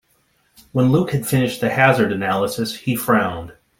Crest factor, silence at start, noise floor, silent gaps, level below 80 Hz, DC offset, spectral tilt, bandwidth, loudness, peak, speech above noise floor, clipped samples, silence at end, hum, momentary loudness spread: 18 dB; 0.75 s; -62 dBFS; none; -52 dBFS; under 0.1%; -6 dB/octave; 16.5 kHz; -18 LUFS; -2 dBFS; 44 dB; under 0.1%; 0.3 s; none; 9 LU